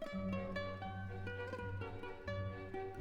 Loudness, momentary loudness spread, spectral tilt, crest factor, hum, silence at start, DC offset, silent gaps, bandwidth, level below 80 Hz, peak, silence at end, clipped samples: -45 LUFS; 4 LU; -7.5 dB/octave; 14 dB; none; 0 s; under 0.1%; none; 9.2 kHz; -58 dBFS; -30 dBFS; 0 s; under 0.1%